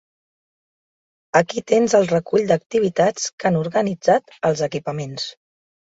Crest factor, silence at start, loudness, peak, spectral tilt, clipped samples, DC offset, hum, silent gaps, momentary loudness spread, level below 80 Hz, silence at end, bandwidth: 18 dB; 1.35 s; -20 LUFS; -2 dBFS; -5 dB/octave; under 0.1%; under 0.1%; none; 2.66-2.70 s, 3.33-3.38 s; 10 LU; -62 dBFS; 0.6 s; 8 kHz